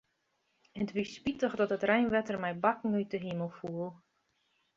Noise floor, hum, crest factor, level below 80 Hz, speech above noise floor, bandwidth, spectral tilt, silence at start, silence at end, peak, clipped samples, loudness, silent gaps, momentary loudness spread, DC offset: -78 dBFS; none; 22 dB; -68 dBFS; 46 dB; 7.6 kHz; -6.5 dB/octave; 0.75 s; 0.8 s; -12 dBFS; under 0.1%; -33 LUFS; none; 11 LU; under 0.1%